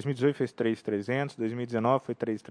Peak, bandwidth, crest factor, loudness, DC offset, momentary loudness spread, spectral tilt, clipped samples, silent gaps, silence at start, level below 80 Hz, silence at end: -10 dBFS; 10.5 kHz; 18 dB; -30 LUFS; under 0.1%; 6 LU; -7.5 dB/octave; under 0.1%; none; 0 s; -76 dBFS; 0.05 s